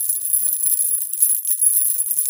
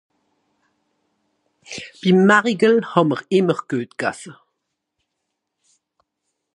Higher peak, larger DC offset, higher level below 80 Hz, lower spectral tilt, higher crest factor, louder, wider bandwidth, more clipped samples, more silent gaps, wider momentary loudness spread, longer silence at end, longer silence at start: about the same, 0 dBFS vs 0 dBFS; neither; second, -78 dBFS vs -68 dBFS; second, 6.5 dB/octave vs -6 dB/octave; about the same, 18 dB vs 20 dB; first, -15 LUFS vs -18 LUFS; first, over 20 kHz vs 10.5 kHz; neither; neither; second, 3 LU vs 20 LU; second, 0 s vs 2.2 s; second, 0 s vs 1.7 s